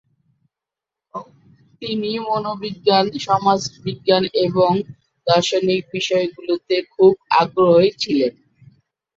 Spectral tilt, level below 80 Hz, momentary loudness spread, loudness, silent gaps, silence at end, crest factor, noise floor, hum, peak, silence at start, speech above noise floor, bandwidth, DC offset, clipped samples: -5 dB/octave; -62 dBFS; 12 LU; -18 LUFS; none; 0.85 s; 18 dB; -87 dBFS; none; -2 dBFS; 1.15 s; 69 dB; 7.8 kHz; under 0.1%; under 0.1%